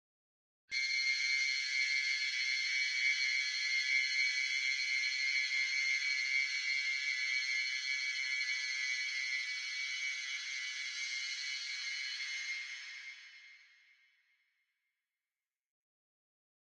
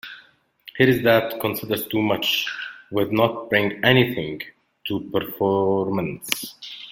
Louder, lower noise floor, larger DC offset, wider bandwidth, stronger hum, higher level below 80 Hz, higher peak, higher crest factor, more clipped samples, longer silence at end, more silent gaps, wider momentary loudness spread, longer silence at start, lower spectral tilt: second, -33 LUFS vs -21 LUFS; first, under -90 dBFS vs -54 dBFS; neither; second, 11.5 kHz vs 17 kHz; neither; second, under -90 dBFS vs -58 dBFS; second, -22 dBFS vs 0 dBFS; second, 16 dB vs 22 dB; neither; first, 3.2 s vs 0 s; neither; second, 7 LU vs 16 LU; first, 0.7 s vs 0.05 s; second, 8 dB/octave vs -5 dB/octave